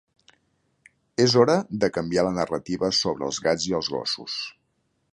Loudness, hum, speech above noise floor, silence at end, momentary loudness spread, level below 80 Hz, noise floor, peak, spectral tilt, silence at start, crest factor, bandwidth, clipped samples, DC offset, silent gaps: -24 LUFS; none; 48 dB; 0.6 s; 11 LU; -56 dBFS; -72 dBFS; -4 dBFS; -4.5 dB/octave; 1.2 s; 22 dB; 11 kHz; under 0.1%; under 0.1%; none